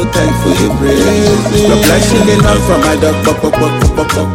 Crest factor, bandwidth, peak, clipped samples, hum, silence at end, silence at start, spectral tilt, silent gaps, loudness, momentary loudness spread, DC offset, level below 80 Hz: 10 dB; 17 kHz; 0 dBFS; 0.3%; none; 0 s; 0 s; -5 dB/octave; none; -10 LUFS; 4 LU; under 0.1%; -22 dBFS